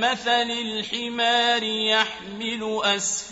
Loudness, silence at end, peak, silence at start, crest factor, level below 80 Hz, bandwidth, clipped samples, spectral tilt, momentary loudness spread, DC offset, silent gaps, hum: -22 LUFS; 0 s; -6 dBFS; 0 s; 18 dB; -62 dBFS; 8 kHz; under 0.1%; -1 dB/octave; 8 LU; under 0.1%; none; none